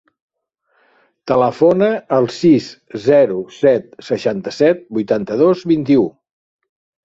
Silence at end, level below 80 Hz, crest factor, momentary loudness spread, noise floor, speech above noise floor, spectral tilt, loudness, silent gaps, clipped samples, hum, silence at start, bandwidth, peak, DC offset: 0.95 s; -56 dBFS; 16 dB; 8 LU; -66 dBFS; 51 dB; -7 dB/octave; -15 LUFS; none; under 0.1%; none; 1.25 s; 7.8 kHz; 0 dBFS; under 0.1%